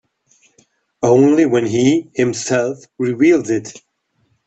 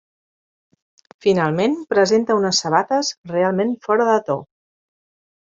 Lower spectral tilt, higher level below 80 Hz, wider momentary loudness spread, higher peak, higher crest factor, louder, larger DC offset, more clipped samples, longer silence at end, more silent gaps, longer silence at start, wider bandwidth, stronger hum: about the same, -5.5 dB/octave vs -4.5 dB/octave; about the same, -58 dBFS vs -62 dBFS; first, 11 LU vs 6 LU; about the same, 0 dBFS vs -2 dBFS; about the same, 16 dB vs 18 dB; first, -15 LUFS vs -19 LUFS; neither; neither; second, 0.7 s vs 1 s; second, none vs 3.18-3.24 s; second, 1 s vs 1.25 s; about the same, 8.2 kHz vs 7.8 kHz; neither